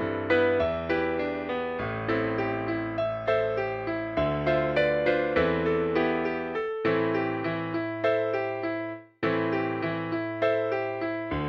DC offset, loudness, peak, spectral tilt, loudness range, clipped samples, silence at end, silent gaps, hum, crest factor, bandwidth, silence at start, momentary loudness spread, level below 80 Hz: under 0.1%; -27 LUFS; -10 dBFS; -8 dB/octave; 3 LU; under 0.1%; 0 s; none; none; 18 dB; 6.4 kHz; 0 s; 6 LU; -52 dBFS